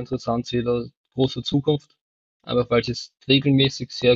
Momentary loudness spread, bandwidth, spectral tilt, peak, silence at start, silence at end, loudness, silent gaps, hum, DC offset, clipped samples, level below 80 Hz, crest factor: 9 LU; 7.8 kHz; -6 dB/octave; -4 dBFS; 0 s; 0 s; -22 LUFS; 0.97-1.04 s, 2.01-2.40 s; none; under 0.1%; under 0.1%; -50 dBFS; 18 dB